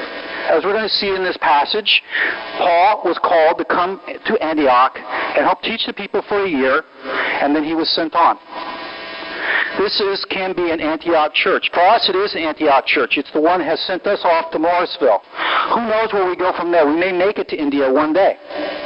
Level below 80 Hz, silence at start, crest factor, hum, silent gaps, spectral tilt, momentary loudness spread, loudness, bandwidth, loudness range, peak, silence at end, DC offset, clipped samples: -54 dBFS; 0 s; 14 dB; none; none; -6.5 dB/octave; 7 LU; -16 LUFS; 5.8 kHz; 3 LU; -2 dBFS; 0 s; under 0.1%; under 0.1%